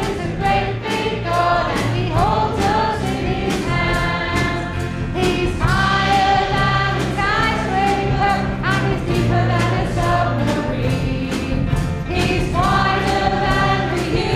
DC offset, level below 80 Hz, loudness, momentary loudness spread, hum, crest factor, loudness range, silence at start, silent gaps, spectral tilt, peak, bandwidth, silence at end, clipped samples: under 0.1%; -30 dBFS; -18 LUFS; 5 LU; none; 16 dB; 2 LU; 0 s; none; -6 dB/octave; -2 dBFS; 15.5 kHz; 0 s; under 0.1%